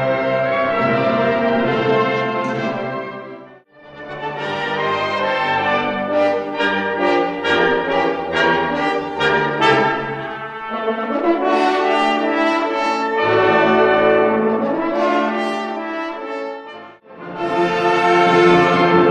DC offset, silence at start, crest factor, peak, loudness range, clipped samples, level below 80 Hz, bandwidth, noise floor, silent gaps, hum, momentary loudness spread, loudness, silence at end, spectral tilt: under 0.1%; 0 s; 16 dB; -2 dBFS; 6 LU; under 0.1%; -54 dBFS; 9.6 kHz; -42 dBFS; none; none; 13 LU; -17 LUFS; 0 s; -6 dB/octave